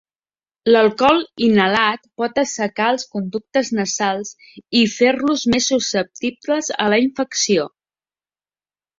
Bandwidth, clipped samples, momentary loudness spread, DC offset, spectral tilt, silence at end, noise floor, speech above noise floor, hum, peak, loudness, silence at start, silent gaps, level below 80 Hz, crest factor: 7.8 kHz; under 0.1%; 10 LU; under 0.1%; -3.5 dB/octave; 1.35 s; under -90 dBFS; over 72 dB; none; -2 dBFS; -18 LUFS; 0.65 s; none; -56 dBFS; 18 dB